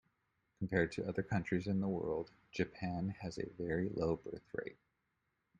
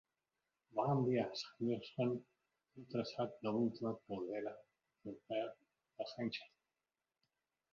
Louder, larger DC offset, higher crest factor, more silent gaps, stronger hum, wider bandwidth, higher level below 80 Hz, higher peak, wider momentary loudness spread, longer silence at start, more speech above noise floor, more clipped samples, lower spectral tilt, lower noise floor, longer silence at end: about the same, -40 LUFS vs -42 LUFS; neither; about the same, 22 dB vs 18 dB; neither; neither; first, 9.6 kHz vs 7.2 kHz; first, -64 dBFS vs -82 dBFS; first, -18 dBFS vs -24 dBFS; about the same, 10 LU vs 12 LU; second, 0.6 s vs 0.75 s; second, 45 dB vs over 49 dB; neither; first, -7.5 dB/octave vs -6 dB/octave; second, -84 dBFS vs under -90 dBFS; second, 0.85 s vs 1.25 s